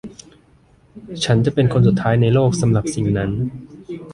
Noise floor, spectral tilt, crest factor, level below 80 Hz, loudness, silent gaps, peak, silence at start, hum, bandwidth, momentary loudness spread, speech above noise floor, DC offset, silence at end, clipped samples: -52 dBFS; -6.5 dB/octave; 16 dB; -42 dBFS; -17 LUFS; none; -2 dBFS; 0.05 s; none; 11.5 kHz; 19 LU; 36 dB; under 0.1%; 0 s; under 0.1%